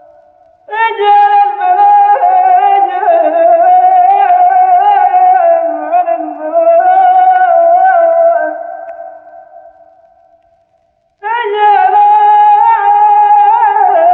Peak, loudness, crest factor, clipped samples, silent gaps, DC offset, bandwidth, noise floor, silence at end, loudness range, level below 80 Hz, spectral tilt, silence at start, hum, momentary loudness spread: 0 dBFS; -8 LUFS; 8 dB; under 0.1%; none; under 0.1%; 4.2 kHz; -56 dBFS; 0 s; 7 LU; -66 dBFS; -4.5 dB/octave; 0.7 s; none; 9 LU